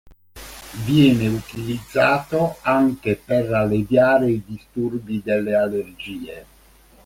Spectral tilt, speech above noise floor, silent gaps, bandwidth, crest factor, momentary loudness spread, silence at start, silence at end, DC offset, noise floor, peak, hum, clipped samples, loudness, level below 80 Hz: -7 dB/octave; 31 dB; none; 16.5 kHz; 18 dB; 18 LU; 0.35 s; 0.6 s; under 0.1%; -51 dBFS; -4 dBFS; none; under 0.1%; -20 LUFS; -48 dBFS